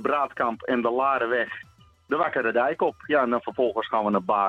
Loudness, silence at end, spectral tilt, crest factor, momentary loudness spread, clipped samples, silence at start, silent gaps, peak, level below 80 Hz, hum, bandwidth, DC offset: -25 LUFS; 0 s; -7 dB/octave; 16 dB; 4 LU; under 0.1%; 0 s; none; -8 dBFS; -66 dBFS; none; 7.4 kHz; under 0.1%